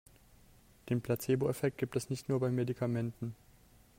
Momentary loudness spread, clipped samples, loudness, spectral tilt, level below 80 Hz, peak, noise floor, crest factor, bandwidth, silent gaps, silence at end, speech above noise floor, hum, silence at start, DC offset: 9 LU; under 0.1%; -35 LUFS; -7 dB/octave; -66 dBFS; -20 dBFS; -62 dBFS; 16 dB; 16 kHz; none; 0.65 s; 28 dB; none; 0.85 s; under 0.1%